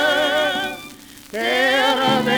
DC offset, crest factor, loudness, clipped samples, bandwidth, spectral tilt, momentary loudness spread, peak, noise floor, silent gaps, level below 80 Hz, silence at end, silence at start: under 0.1%; 14 dB; -18 LUFS; under 0.1%; over 20 kHz; -3 dB/octave; 16 LU; -6 dBFS; -40 dBFS; none; -56 dBFS; 0 s; 0 s